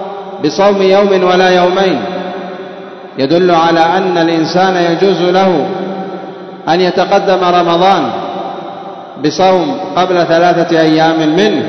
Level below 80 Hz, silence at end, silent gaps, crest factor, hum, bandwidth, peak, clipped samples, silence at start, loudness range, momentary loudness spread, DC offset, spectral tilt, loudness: -54 dBFS; 0 s; none; 10 dB; none; 6.4 kHz; 0 dBFS; 0.1%; 0 s; 2 LU; 15 LU; under 0.1%; -5.5 dB/octave; -10 LUFS